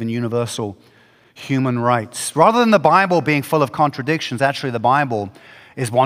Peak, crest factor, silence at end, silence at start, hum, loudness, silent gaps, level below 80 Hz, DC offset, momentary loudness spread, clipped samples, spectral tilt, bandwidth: 0 dBFS; 18 dB; 0 s; 0 s; none; -17 LUFS; none; -64 dBFS; under 0.1%; 13 LU; under 0.1%; -5.5 dB/octave; 16 kHz